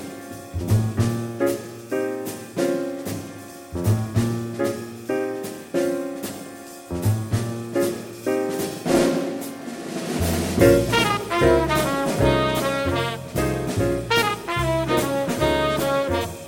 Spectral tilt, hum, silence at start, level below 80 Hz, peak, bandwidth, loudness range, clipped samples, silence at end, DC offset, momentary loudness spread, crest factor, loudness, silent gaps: -5.5 dB/octave; none; 0 s; -40 dBFS; -2 dBFS; 17 kHz; 7 LU; under 0.1%; 0 s; under 0.1%; 12 LU; 20 dB; -23 LUFS; none